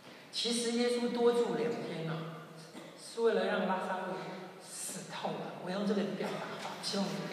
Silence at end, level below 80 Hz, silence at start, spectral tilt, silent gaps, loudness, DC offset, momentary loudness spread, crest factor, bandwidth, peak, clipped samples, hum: 0 s; -88 dBFS; 0 s; -4 dB/octave; none; -35 LUFS; under 0.1%; 15 LU; 18 dB; 15 kHz; -18 dBFS; under 0.1%; none